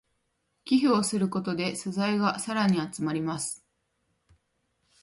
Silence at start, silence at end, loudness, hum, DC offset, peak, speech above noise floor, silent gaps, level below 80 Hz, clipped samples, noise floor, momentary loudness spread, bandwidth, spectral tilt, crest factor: 0.65 s; 1.45 s; -27 LUFS; none; under 0.1%; -12 dBFS; 49 dB; none; -68 dBFS; under 0.1%; -76 dBFS; 9 LU; 11.5 kHz; -5 dB/octave; 18 dB